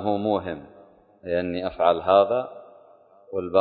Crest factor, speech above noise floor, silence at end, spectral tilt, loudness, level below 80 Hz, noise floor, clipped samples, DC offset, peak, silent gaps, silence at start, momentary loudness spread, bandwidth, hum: 20 dB; 31 dB; 0 s; -10.5 dB/octave; -23 LUFS; -54 dBFS; -53 dBFS; under 0.1%; under 0.1%; -4 dBFS; none; 0 s; 18 LU; 4.7 kHz; none